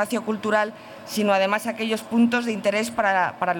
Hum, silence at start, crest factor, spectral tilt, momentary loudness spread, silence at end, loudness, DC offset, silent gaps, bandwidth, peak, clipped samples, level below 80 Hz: none; 0 s; 14 dB; -4.5 dB/octave; 6 LU; 0 s; -23 LUFS; under 0.1%; none; 20 kHz; -8 dBFS; under 0.1%; -66 dBFS